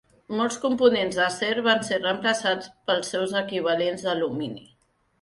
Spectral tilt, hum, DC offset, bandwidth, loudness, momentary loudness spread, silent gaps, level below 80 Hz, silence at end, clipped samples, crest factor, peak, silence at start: -3.5 dB/octave; none; under 0.1%; 11.5 kHz; -24 LUFS; 8 LU; none; -66 dBFS; 0.6 s; under 0.1%; 20 dB; -6 dBFS; 0.3 s